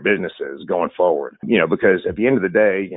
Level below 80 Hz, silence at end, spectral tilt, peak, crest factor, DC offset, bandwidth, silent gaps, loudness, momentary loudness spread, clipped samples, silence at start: -52 dBFS; 0 s; -11 dB/octave; -4 dBFS; 16 dB; under 0.1%; 4 kHz; none; -18 LUFS; 8 LU; under 0.1%; 0 s